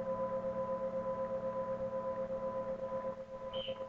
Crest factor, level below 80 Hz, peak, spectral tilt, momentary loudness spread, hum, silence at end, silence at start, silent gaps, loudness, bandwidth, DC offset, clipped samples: 10 dB; -64 dBFS; -28 dBFS; -7 dB/octave; 4 LU; none; 0 s; 0 s; none; -39 LUFS; 7 kHz; under 0.1%; under 0.1%